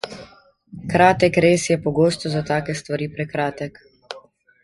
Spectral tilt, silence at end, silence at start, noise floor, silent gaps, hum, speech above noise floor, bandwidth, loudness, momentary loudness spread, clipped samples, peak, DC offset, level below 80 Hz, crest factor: -5.5 dB/octave; 0.45 s; 0.05 s; -49 dBFS; none; none; 30 dB; 11.5 kHz; -19 LUFS; 22 LU; under 0.1%; -2 dBFS; under 0.1%; -50 dBFS; 20 dB